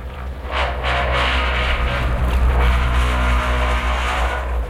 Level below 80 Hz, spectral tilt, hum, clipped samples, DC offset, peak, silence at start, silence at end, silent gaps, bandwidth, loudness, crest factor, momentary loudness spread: -20 dBFS; -5.5 dB/octave; none; under 0.1%; under 0.1%; -8 dBFS; 0 s; 0 s; none; 12 kHz; -19 LUFS; 10 dB; 4 LU